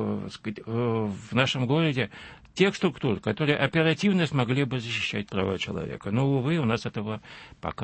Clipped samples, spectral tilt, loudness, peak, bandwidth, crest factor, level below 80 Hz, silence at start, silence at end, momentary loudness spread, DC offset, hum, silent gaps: under 0.1%; -6 dB/octave; -27 LUFS; -8 dBFS; 8.8 kHz; 20 dB; -56 dBFS; 0 s; 0 s; 12 LU; under 0.1%; none; none